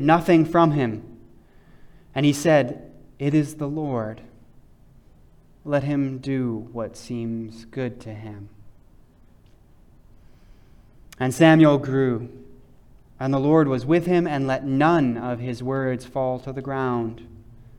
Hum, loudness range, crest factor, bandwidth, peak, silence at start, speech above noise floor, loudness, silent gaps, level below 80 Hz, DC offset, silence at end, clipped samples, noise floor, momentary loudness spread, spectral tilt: none; 13 LU; 20 dB; 14.5 kHz; -4 dBFS; 0 s; 31 dB; -22 LUFS; none; -52 dBFS; under 0.1%; 0.45 s; under 0.1%; -52 dBFS; 17 LU; -7 dB/octave